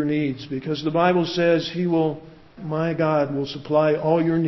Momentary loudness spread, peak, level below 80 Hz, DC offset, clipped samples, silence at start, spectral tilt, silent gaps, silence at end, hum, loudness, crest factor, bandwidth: 9 LU; -6 dBFS; -58 dBFS; under 0.1%; under 0.1%; 0 s; -7.5 dB/octave; none; 0 s; none; -22 LUFS; 16 dB; 6 kHz